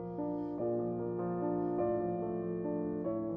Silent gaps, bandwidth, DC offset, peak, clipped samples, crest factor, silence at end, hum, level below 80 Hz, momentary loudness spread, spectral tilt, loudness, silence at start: none; 2.5 kHz; under 0.1%; -22 dBFS; under 0.1%; 14 dB; 0 s; none; -64 dBFS; 4 LU; -11 dB/octave; -36 LUFS; 0 s